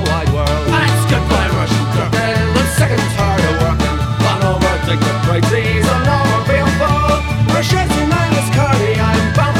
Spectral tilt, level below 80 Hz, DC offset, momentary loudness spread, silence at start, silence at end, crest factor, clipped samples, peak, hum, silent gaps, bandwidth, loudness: -5.5 dB/octave; -24 dBFS; under 0.1%; 2 LU; 0 s; 0 s; 12 dB; under 0.1%; 0 dBFS; none; none; 16 kHz; -14 LUFS